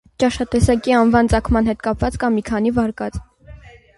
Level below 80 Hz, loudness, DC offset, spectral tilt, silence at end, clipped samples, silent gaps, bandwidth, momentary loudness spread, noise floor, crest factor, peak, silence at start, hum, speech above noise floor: -30 dBFS; -18 LUFS; under 0.1%; -6.5 dB/octave; 0.3 s; under 0.1%; none; 11.5 kHz; 8 LU; -41 dBFS; 16 dB; -2 dBFS; 0.2 s; none; 24 dB